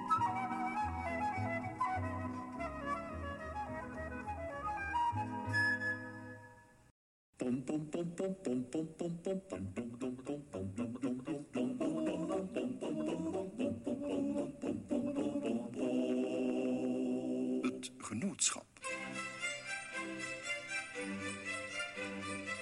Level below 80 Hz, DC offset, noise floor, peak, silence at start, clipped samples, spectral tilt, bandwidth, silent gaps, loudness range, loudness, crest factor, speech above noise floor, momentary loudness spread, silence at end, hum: -62 dBFS; under 0.1%; -60 dBFS; -20 dBFS; 0 s; under 0.1%; -4.5 dB/octave; 12 kHz; 6.91-7.33 s; 4 LU; -39 LUFS; 20 dB; 21 dB; 8 LU; 0 s; none